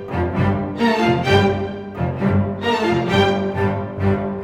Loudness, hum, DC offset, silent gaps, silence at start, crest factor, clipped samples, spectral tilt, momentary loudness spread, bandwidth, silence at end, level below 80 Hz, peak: -19 LUFS; none; under 0.1%; none; 0 s; 16 dB; under 0.1%; -7 dB/octave; 6 LU; 11 kHz; 0 s; -42 dBFS; -2 dBFS